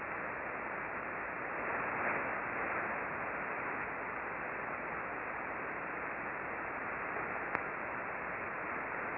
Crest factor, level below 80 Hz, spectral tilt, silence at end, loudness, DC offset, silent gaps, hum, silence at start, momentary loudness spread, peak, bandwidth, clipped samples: 26 dB; -66 dBFS; -4.5 dB/octave; 0 s; -38 LUFS; under 0.1%; none; none; 0 s; 3 LU; -14 dBFS; 5.4 kHz; under 0.1%